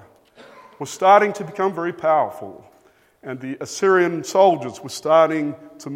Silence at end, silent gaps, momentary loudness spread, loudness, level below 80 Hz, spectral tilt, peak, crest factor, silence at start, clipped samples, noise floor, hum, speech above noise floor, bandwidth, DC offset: 0 s; none; 20 LU; -19 LUFS; -70 dBFS; -5 dB/octave; 0 dBFS; 20 dB; 0.8 s; under 0.1%; -56 dBFS; none; 37 dB; 16 kHz; under 0.1%